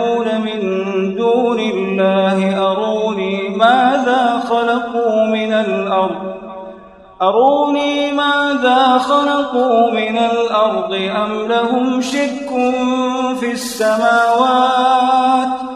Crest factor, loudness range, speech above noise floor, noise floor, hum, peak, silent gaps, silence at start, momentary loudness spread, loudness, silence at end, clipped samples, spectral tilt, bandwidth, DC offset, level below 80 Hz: 14 dB; 3 LU; 24 dB; -38 dBFS; none; 0 dBFS; none; 0 s; 6 LU; -15 LUFS; 0 s; under 0.1%; -5 dB/octave; 13 kHz; under 0.1%; -56 dBFS